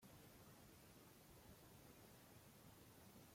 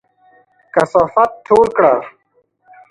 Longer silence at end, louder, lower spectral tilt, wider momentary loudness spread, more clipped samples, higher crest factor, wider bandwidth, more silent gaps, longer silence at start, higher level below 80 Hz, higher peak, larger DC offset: second, 0 s vs 0.8 s; second, -65 LUFS vs -14 LUFS; second, -4 dB/octave vs -6.5 dB/octave; second, 1 LU vs 8 LU; neither; about the same, 14 dB vs 16 dB; first, 16.5 kHz vs 11.5 kHz; neither; second, 0 s vs 0.75 s; second, -78 dBFS vs -52 dBFS; second, -52 dBFS vs 0 dBFS; neither